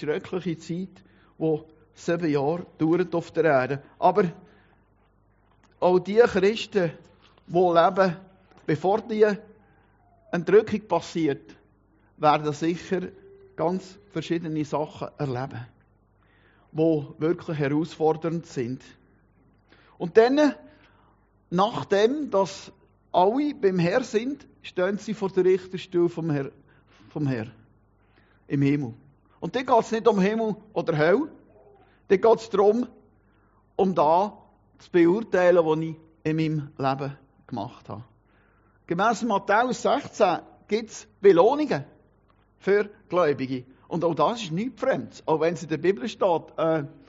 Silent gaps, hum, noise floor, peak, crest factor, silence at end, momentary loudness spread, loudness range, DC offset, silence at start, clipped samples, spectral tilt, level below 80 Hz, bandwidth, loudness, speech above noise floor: none; none; -62 dBFS; -4 dBFS; 22 dB; 0.15 s; 14 LU; 6 LU; under 0.1%; 0 s; under 0.1%; -5.5 dB/octave; -64 dBFS; 7.6 kHz; -24 LUFS; 39 dB